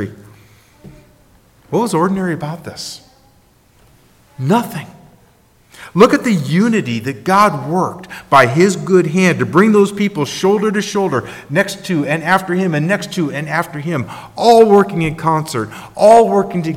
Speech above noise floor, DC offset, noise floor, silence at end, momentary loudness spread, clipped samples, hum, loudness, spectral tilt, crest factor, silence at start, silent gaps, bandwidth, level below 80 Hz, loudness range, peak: 37 dB; under 0.1%; -51 dBFS; 0 s; 14 LU; under 0.1%; none; -14 LUFS; -6 dB/octave; 14 dB; 0 s; none; 16.5 kHz; -52 dBFS; 9 LU; 0 dBFS